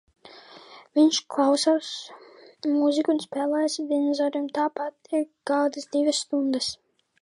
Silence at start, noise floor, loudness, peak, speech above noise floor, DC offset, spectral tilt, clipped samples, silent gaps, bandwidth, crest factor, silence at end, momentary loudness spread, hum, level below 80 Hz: 0.25 s; -48 dBFS; -25 LUFS; -8 dBFS; 24 dB; under 0.1%; -2.5 dB/octave; under 0.1%; none; 11.5 kHz; 16 dB; 0.5 s; 10 LU; none; -74 dBFS